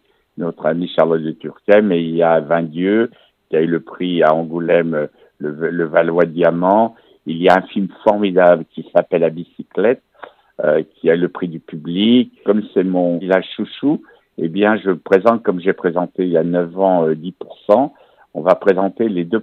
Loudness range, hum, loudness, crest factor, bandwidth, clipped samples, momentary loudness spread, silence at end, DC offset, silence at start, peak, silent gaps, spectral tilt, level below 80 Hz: 3 LU; none; -16 LUFS; 16 dB; 6.4 kHz; under 0.1%; 12 LU; 0 s; under 0.1%; 0.35 s; 0 dBFS; none; -8.5 dB/octave; -66 dBFS